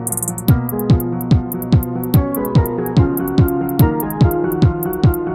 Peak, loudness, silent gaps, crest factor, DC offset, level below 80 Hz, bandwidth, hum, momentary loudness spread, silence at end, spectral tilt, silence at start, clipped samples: 0 dBFS; -16 LUFS; none; 14 dB; under 0.1%; -28 dBFS; 18 kHz; none; 2 LU; 0 s; -7 dB/octave; 0 s; under 0.1%